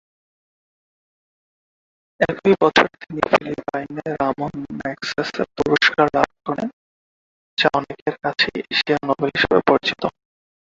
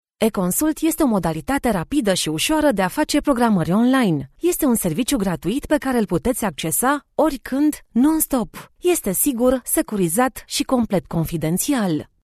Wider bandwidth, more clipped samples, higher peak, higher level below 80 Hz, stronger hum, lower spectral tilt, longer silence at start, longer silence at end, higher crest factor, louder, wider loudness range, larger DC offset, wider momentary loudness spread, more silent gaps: second, 7.8 kHz vs 14 kHz; neither; first, 0 dBFS vs -4 dBFS; second, -54 dBFS vs -42 dBFS; neither; about the same, -5 dB/octave vs -4.5 dB/octave; first, 2.2 s vs 0.2 s; first, 0.5 s vs 0.2 s; first, 22 dB vs 16 dB; about the same, -20 LUFS vs -20 LUFS; about the same, 2 LU vs 2 LU; neither; first, 12 LU vs 5 LU; first, 6.73-7.57 s, 8.02-8.06 s vs none